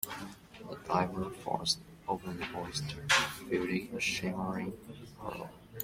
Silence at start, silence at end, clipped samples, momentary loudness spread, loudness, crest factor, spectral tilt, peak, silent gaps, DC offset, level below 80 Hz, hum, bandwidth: 0 s; 0 s; under 0.1%; 18 LU; -34 LUFS; 22 dB; -3.5 dB/octave; -14 dBFS; none; under 0.1%; -60 dBFS; none; 16.5 kHz